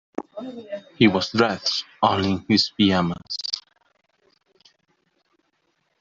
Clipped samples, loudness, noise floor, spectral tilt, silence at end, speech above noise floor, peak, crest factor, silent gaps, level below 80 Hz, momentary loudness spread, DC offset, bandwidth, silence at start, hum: under 0.1%; -21 LUFS; -71 dBFS; -5 dB/octave; 2.4 s; 49 dB; -2 dBFS; 22 dB; none; -62 dBFS; 17 LU; under 0.1%; 7.6 kHz; 0.2 s; none